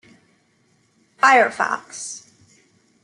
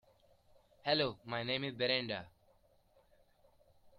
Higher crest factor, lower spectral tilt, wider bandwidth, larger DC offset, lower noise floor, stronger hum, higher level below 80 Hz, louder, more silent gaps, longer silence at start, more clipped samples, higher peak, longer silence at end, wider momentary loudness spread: about the same, 22 dB vs 22 dB; second, -1.5 dB/octave vs -6.5 dB/octave; about the same, 11.5 kHz vs 12 kHz; neither; second, -62 dBFS vs -70 dBFS; neither; about the same, -76 dBFS vs -74 dBFS; first, -18 LUFS vs -36 LUFS; neither; first, 1.25 s vs 0.85 s; neither; first, -2 dBFS vs -18 dBFS; first, 0.85 s vs 0.1 s; first, 18 LU vs 9 LU